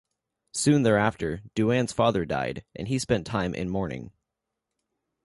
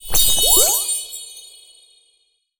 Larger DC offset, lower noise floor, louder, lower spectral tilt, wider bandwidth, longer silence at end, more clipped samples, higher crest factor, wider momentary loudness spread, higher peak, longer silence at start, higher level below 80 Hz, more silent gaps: neither; first, -84 dBFS vs -64 dBFS; second, -26 LUFS vs -14 LUFS; first, -5.5 dB/octave vs 0.5 dB/octave; second, 11.5 kHz vs over 20 kHz; about the same, 1.15 s vs 1.15 s; neither; about the same, 20 dB vs 18 dB; second, 12 LU vs 20 LU; second, -8 dBFS vs 0 dBFS; first, 0.55 s vs 0.05 s; second, -50 dBFS vs -34 dBFS; neither